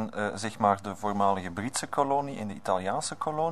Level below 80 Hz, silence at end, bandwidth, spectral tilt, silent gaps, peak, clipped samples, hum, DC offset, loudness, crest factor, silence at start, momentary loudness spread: -66 dBFS; 0 s; 13.5 kHz; -4.5 dB/octave; none; -8 dBFS; under 0.1%; none; 0.4%; -29 LUFS; 20 dB; 0 s; 6 LU